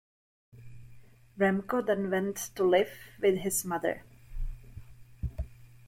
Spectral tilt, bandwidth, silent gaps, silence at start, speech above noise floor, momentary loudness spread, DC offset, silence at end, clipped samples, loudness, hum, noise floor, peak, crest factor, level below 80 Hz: -4.5 dB/octave; 16.5 kHz; none; 0.55 s; 26 dB; 18 LU; under 0.1%; 0 s; under 0.1%; -30 LUFS; none; -54 dBFS; -12 dBFS; 20 dB; -46 dBFS